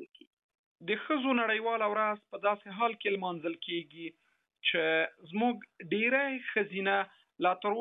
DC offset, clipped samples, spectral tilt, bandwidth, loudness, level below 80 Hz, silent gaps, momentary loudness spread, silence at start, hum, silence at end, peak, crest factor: under 0.1%; under 0.1%; -7.5 dB/octave; 4 kHz; -31 LUFS; -88 dBFS; 0.27-0.37 s, 0.43-0.49 s, 0.59-0.75 s; 9 LU; 0 s; none; 0 s; -14 dBFS; 18 dB